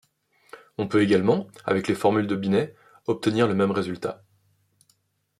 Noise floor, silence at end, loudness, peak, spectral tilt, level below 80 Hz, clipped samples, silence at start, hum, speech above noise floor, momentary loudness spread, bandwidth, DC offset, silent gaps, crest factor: -68 dBFS; 1.25 s; -24 LUFS; -6 dBFS; -6.5 dB/octave; -66 dBFS; under 0.1%; 0.55 s; none; 45 dB; 13 LU; 13 kHz; under 0.1%; none; 18 dB